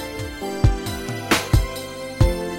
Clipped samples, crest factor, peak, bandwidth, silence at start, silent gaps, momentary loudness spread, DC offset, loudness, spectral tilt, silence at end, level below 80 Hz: under 0.1%; 18 dB; -4 dBFS; 16.5 kHz; 0 s; none; 11 LU; under 0.1%; -23 LUFS; -5 dB/octave; 0 s; -26 dBFS